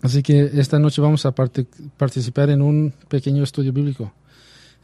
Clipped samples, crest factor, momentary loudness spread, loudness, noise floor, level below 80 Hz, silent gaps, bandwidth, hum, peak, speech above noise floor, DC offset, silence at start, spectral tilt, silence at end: under 0.1%; 16 dB; 9 LU; -19 LUFS; -49 dBFS; -56 dBFS; none; 11 kHz; none; -4 dBFS; 31 dB; under 0.1%; 0.05 s; -7.5 dB/octave; 0.75 s